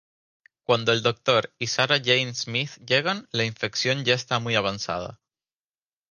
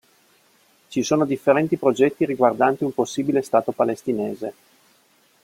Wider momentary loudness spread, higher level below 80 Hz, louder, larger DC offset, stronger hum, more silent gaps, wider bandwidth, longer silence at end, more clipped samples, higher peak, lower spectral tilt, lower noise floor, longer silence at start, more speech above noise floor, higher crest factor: about the same, 8 LU vs 8 LU; about the same, -62 dBFS vs -64 dBFS; second, -24 LUFS vs -21 LUFS; neither; neither; neither; second, 10.5 kHz vs 16 kHz; about the same, 0.95 s vs 0.9 s; neither; about the same, -4 dBFS vs -2 dBFS; second, -3.5 dB/octave vs -5.5 dB/octave; first, under -90 dBFS vs -60 dBFS; second, 0.7 s vs 0.9 s; first, over 65 dB vs 39 dB; about the same, 22 dB vs 20 dB